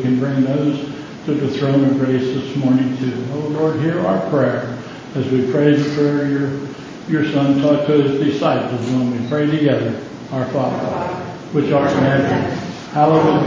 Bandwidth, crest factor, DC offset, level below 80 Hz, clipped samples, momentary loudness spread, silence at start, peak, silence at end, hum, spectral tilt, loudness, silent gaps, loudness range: 7.6 kHz; 16 dB; under 0.1%; -50 dBFS; under 0.1%; 10 LU; 0 s; -2 dBFS; 0 s; none; -7.5 dB/octave; -18 LUFS; none; 2 LU